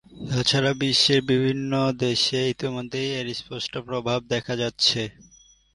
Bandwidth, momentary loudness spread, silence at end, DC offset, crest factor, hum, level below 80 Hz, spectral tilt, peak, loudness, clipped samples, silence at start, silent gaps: 11.5 kHz; 10 LU; 0.55 s; under 0.1%; 20 dB; none; -56 dBFS; -4.5 dB/octave; -4 dBFS; -23 LUFS; under 0.1%; 0.1 s; none